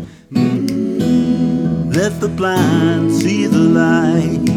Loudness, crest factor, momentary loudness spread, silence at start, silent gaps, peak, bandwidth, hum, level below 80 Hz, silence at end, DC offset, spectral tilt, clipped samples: -15 LUFS; 12 dB; 6 LU; 0 s; none; -2 dBFS; 16 kHz; none; -42 dBFS; 0 s; under 0.1%; -6.5 dB/octave; under 0.1%